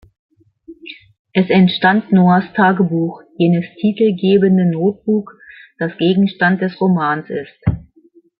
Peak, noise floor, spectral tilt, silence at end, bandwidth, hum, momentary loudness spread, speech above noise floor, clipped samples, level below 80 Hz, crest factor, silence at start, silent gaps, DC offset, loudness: 0 dBFS; -51 dBFS; -11.5 dB/octave; 0.55 s; 5.2 kHz; none; 12 LU; 37 dB; under 0.1%; -46 dBFS; 14 dB; 0.7 s; 1.19-1.25 s; under 0.1%; -15 LUFS